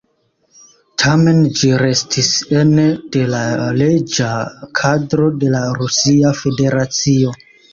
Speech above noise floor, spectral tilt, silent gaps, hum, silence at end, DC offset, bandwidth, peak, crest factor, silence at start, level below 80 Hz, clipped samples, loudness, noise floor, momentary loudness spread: 48 dB; -5 dB/octave; none; none; 0.35 s; under 0.1%; 7.6 kHz; -2 dBFS; 14 dB; 1 s; -48 dBFS; under 0.1%; -14 LUFS; -62 dBFS; 6 LU